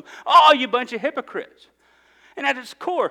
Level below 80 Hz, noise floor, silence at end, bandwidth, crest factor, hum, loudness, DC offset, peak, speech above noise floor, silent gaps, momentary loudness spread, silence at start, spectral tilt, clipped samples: -72 dBFS; -56 dBFS; 0 s; 15.5 kHz; 20 dB; none; -18 LUFS; under 0.1%; -2 dBFS; 36 dB; none; 17 LU; 0.1 s; -2.5 dB/octave; under 0.1%